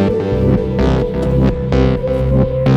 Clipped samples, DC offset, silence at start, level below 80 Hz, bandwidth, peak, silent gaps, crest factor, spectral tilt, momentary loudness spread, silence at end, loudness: under 0.1%; under 0.1%; 0 s; -22 dBFS; 7 kHz; -2 dBFS; none; 12 dB; -9 dB/octave; 2 LU; 0 s; -15 LUFS